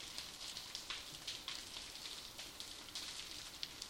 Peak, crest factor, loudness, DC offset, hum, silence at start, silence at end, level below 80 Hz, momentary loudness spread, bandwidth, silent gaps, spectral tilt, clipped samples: -22 dBFS; 28 dB; -47 LUFS; under 0.1%; none; 0 s; 0 s; -68 dBFS; 3 LU; 16.5 kHz; none; 0 dB/octave; under 0.1%